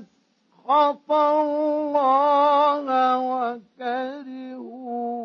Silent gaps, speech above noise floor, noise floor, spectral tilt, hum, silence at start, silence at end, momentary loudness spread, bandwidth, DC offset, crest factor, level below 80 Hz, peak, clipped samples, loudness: none; 43 dB; -64 dBFS; -5 dB/octave; none; 0 s; 0 s; 18 LU; 6.4 kHz; under 0.1%; 14 dB; -84 dBFS; -8 dBFS; under 0.1%; -21 LUFS